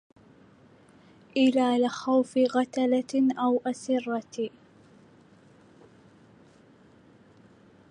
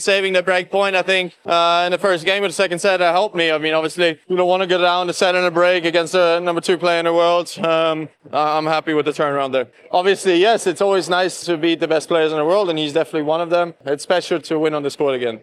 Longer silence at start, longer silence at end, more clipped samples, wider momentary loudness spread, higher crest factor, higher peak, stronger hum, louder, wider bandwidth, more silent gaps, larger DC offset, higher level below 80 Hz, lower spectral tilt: first, 1.35 s vs 0 s; first, 3.4 s vs 0.05 s; neither; first, 10 LU vs 5 LU; about the same, 18 dB vs 14 dB; second, -12 dBFS vs -4 dBFS; neither; second, -26 LUFS vs -17 LUFS; second, 10.5 kHz vs 13 kHz; neither; neither; about the same, -76 dBFS vs -74 dBFS; about the same, -4.5 dB/octave vs -4 dB/octave